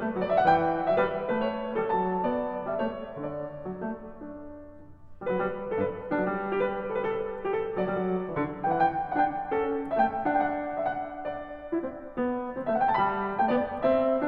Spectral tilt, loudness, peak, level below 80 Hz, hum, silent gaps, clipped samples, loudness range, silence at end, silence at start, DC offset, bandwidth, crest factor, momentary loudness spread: -9 dB/octave; -29 LUFS; -10 dBFS; -54 dBFS; none; none; under 0.1%; 6 LU; 0 s; 0 s; under 0.1%; 5.4 kHz; 18 dB; 11 LU